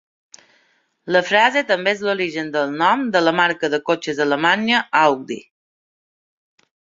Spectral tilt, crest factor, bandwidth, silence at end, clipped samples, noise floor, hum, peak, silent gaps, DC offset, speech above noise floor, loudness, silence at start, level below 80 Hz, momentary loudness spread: -4 dB/octave; 18 dB; 7.8 kHz; 1.4 s; under 0.1%; -62 dBFS; none; -2 dBFS; none; under 0.1%; 43 dB; -18 LUFS; 1.05 s; -68 dBFS; 7 LU